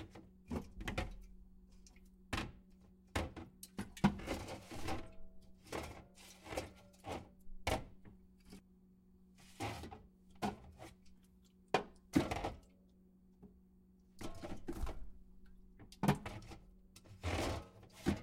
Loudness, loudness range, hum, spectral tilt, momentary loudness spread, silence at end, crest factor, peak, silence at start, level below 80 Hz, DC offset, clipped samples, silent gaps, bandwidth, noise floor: -43 LUFS; 7 LU; none; -5.5 dB/octave; 26 LU; 0 s; 28 dB; -18 dBFS; 0 s; -54 dBFS; under 0.1%; under 0.1%; none; 16 kHz; -67 dBFS